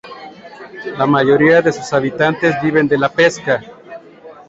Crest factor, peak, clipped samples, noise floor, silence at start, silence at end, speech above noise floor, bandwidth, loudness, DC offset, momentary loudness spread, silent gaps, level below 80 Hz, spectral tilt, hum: 14 dB; -2 dBFS; under 0.1%; -39 dBFS; 0.05 s; 0.15 s; 25 dB; 8 kHz; -14 LUFS; under 0.1%; 23 LU; none; -54 dBFS; -6 dB/octave; none